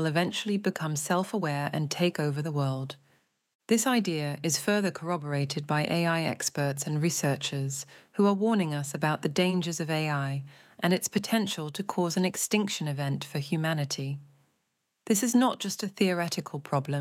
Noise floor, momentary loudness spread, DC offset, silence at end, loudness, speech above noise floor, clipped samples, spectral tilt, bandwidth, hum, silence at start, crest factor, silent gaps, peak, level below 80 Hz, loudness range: -78 dBFS; 7 LU; under 0.1%; 0 s; -29 LUFS; 50 dB; under 0.1%; -4.5 dB/octave; 17 kHz; none; 0 s; 16 dB; 3.55-3.59 s; -12 dBFS; -76 dBFS; 2 LU